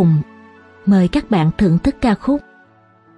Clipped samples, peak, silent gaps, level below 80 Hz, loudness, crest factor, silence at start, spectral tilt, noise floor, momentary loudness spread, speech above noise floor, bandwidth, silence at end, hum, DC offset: under 0.1%; -4 dBFS; none; -36 dBFS; -16 LUFS; 14 dB; 0 s; -8.5 dB/octave; -50 dBFS; 7 LU; 36 dB; 10.5 kHz; 0.8 s; none; under 0.1%